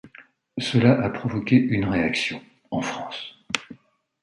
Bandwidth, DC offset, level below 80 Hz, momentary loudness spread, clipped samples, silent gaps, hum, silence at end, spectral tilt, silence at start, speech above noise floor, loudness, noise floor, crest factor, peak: 11 kHz; under 0.1%; -52 dBFS; 14 LU; under 0.1%; none; none; 0.5 s; -6 dB/octave; 0.05 s; 34 dB; -23 LUFS; -56 dBFS; 22 dB; -2 dBFS